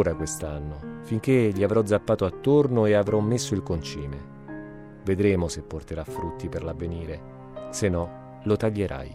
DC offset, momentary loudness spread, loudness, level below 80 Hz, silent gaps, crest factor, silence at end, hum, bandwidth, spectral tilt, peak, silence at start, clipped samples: under 0.1%; 17 LU; -26 LUFS; -46 dBFS; none; 16 dB; 0 s; none; 14.5 kHz; -6.5 dB/octave; -10 dBFS; 0 s; under 0.1%